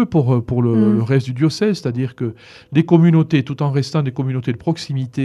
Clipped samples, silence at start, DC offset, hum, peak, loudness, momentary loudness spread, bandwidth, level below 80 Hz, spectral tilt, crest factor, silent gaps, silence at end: under 0.1%; 0 s; under 0.1%; none; 0 dBFS; -17 LUFS; 10 LU; 10.5 kHz; -50 dBFS; -8 dB/octave; 16 dB; none; 0 s